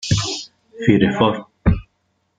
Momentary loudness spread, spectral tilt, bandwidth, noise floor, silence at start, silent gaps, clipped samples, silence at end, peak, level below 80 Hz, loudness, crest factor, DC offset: 11 LU; -5.5 dB/octave; 9.4 kHz; -68 dBFS; 0 s; none; under 0.1%; 0.55 s; 0 dBFS; -34 dBFS; -19 LUFS; 18 dB; under 0.1%